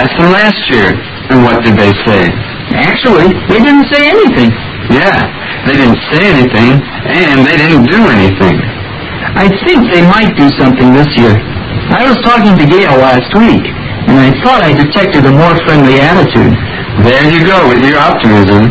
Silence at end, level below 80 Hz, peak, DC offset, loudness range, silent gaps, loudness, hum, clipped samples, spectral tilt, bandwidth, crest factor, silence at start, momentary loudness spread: 0 s; -28 dBFS; 0 dBFS; under 0.1%; 1 LU; none; -6 LUFS; none; 4%; -7.5 dB/octave; 8 kHz; 6 dB; 0 s; 7 LU